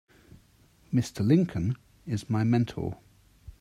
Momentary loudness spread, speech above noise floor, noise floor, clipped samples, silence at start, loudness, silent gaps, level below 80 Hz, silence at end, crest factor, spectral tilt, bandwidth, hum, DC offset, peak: 13 LU; 35 dB; -61 dBFS; under 0.1%; 0.9 s; -28 LUFS; none; -56 dBFS; 0.1 s; 18 dB; -7.5 dB/octave; 13.5 kHz; none; under 0.1%; -10 dBFS